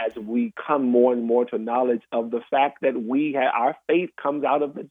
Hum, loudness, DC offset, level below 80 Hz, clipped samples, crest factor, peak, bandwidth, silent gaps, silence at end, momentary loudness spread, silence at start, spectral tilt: none; -23 LUFS; under 0.1%; -76 dBFS; under 0.1%; 16 dB; -6 dBFS; 3.8 kHz; none; 0.05 s; 7 LU; 0 s; -8.5 dB/octave